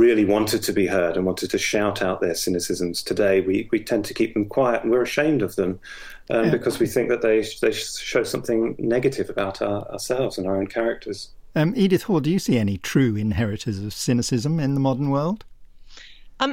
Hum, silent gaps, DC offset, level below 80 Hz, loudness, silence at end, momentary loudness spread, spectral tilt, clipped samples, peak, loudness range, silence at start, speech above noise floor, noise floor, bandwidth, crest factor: none; none; under 0.1%; -48 dBFS; -22 LUFS; 0 s; 7 LU; -5.5 dB/octave; under 0.1%; -4 dBFS; 2 LU; 0 s; 21 dB; -43 dBFS; 16.5 kHz; 18 dB